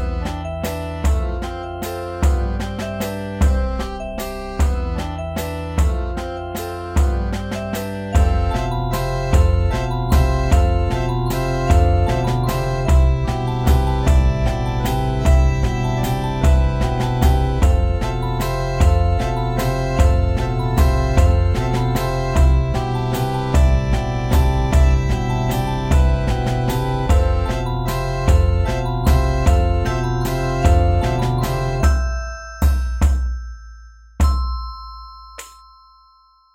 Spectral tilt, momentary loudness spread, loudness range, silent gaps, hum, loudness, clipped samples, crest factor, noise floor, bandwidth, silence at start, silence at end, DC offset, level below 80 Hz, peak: -6.5 dB/octave; 9 LU; 5 LU; none; none; -19 LUFS; under 0.1%; 16 dB; -53 dBFS; 16.5 kHz; 0 s; 1.05 s; under 0.1%; -20 dBFS; -2 dBFS